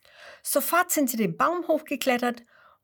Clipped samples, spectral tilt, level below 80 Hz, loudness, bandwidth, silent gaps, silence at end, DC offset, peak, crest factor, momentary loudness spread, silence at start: under 0.1%; -3.5 dB/octave; -74 dBFS; -25 LUFS; 19 kHz; none; 0.45 s; under 0.1%; -6 dBFS; 20 dB; 7 LU; 0.2 s